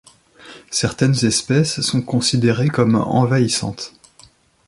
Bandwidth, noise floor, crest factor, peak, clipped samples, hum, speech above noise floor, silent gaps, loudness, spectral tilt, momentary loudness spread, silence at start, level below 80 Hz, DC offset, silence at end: 11.5 kHz; -50 dBFS; 16 dB; -2 dBFS; under 0.1%; none; 33 dB; none; -17 LUFS; -5 dB/octave; 7 LU; 0.45 s; -50 dBFS; under 0.1%; 0.8 s